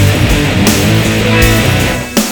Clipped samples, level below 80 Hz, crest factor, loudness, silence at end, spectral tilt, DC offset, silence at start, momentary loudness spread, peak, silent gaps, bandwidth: 0.8%; -20 dBFS; 10 dB; -10 LUFS; 0 s; -4.5 dB/octave; under 0.1%; 0 s; 4 LU; 0 dBFS; none; over 20 kHz